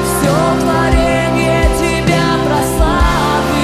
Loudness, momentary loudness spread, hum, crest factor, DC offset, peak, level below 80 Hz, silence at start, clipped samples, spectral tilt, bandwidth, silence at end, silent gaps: -13 LUFS; 1 LU; none; 12 dB; under 0.1%; 0 dBFS; -20 dBFS; 0 s; under 0.1%; -5 dB/octave; 16 kHz; 0 s; none